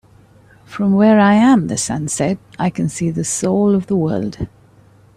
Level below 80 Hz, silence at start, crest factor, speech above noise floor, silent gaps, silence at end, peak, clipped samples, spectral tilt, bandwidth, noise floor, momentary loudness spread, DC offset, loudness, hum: -48 dBFS; 0.7 s; 14 dB; 33 dB; none; 0.7 s; -2 dBFS; under 0.1%; -5.5 dB/octave; 13.5 kHz; -48 dBFS; 12 LU; under 0.1%; -16 LUFS; none